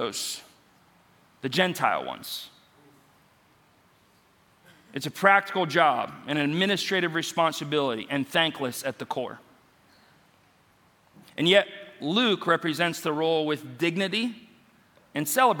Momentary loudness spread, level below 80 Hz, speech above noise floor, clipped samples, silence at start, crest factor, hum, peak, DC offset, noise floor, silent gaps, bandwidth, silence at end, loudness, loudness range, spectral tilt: 15 LU; -74 dBFS; 36 dB; under 0.1%; 0 s; 24 dB; none; -4 dBFS; under 0.1%; -62 dBFS; none; 17.5 kHz; 0 s; -26 LUFS; 7 LU; -4 dB/octave